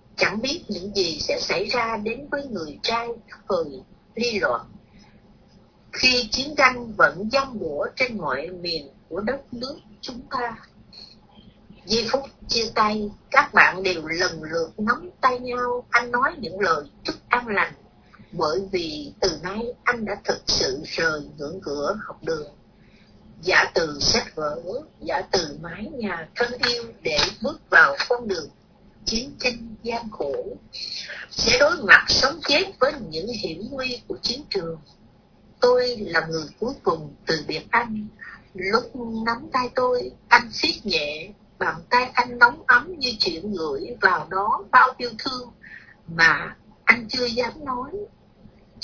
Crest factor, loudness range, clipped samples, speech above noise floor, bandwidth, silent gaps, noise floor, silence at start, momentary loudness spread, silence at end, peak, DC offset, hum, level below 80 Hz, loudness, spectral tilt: 24 dB; 7 LU; under 0.1%; 31 dB; 5.4 kHz; none; -54 dBFS; 0.15 s; 15 LU; 0 s; 0 dBFS; under 0.1%; none; -50 dBFS; -22 LUFS; -2.5 dB/octave